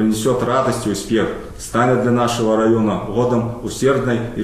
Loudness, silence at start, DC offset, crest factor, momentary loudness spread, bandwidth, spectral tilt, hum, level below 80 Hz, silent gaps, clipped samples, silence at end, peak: -18 LUFS; 0 s; 0.1%; 14 dB; 6 LU; 14.5 kHz; -6 dB/octave; none; -40 dBFS; none; under 0.1%; 0 s; -4 dBFS